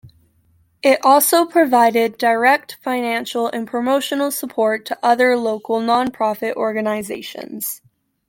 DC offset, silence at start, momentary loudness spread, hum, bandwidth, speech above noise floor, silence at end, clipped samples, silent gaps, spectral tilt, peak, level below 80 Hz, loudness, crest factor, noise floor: under 0.1%; 0.05 s; 12 LU; none; 17 kHz; 41 dB; 0.55 s; under 0.1%; none; -3 dB/octave; -2 dBFS; -64 dBFS; -17 LUFS; 16 dB; -58 dBFS